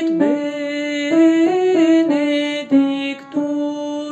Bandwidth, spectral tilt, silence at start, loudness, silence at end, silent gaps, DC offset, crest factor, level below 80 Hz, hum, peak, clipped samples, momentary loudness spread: 8.6 kHz; -5 dB/octave; 0 s; -17 LUFS; 0 s; none; under 0.1%; 14 dB; -66 dBFS; none; -4 dBFS; under 0.1%; 9 LU